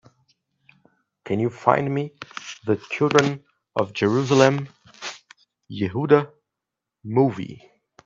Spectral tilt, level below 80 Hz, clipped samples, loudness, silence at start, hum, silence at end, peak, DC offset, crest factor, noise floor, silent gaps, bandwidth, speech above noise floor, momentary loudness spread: -6 dB/octave; -66 dBFS; under 0.1%; -22 LUFS; 1.25 s; none; 0.5 s; 0 dBFS; under 0.1%; 24 dB; -85 dBFS; none; 7.8 kHz; 64 dB; 18 LU